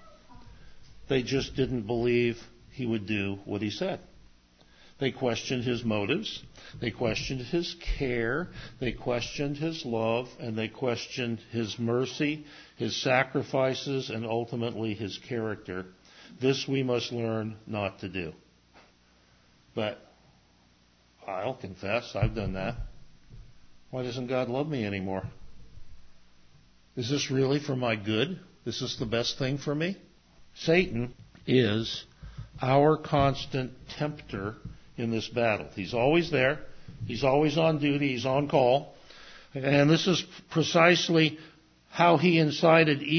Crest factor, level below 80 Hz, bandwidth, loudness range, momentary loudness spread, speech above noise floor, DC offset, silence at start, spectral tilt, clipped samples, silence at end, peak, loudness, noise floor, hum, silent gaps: 22 dB; -50 dBFS; 6.6 kHz; 9 LU; 15 LU; 35 dB; under 0.1%; 0 s; -5.5 dB/octave; under 0.1%; 0 s; -6 dBFS; -28 LUFS; -63 dBFS; none; none